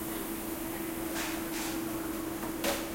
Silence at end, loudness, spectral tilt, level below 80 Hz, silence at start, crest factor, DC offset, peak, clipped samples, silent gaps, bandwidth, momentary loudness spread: 0 s; -35 LUFS; -3.5 dB/octave; -52 dBFS; 0 s; 18 dB; under 0.1%; -16 dBFS; under 0.1%; none; 16.5 kHz; 4 LU